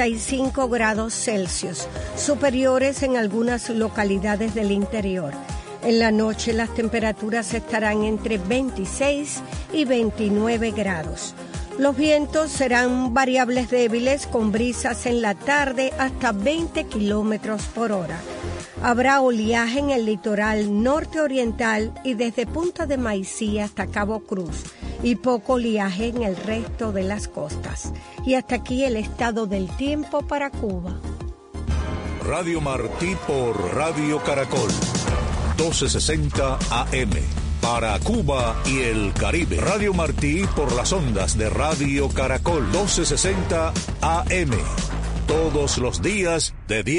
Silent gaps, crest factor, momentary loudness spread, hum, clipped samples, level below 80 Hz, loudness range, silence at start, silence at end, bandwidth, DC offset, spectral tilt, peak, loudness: none; 16 dB; 8 LU; none; under 0.1%; -32 dBFS; 4 LU; 0 s; 0 s; 11 kHz; under 0.1%; -4.5 dB/octave; -6 dBFS; -22 LUFS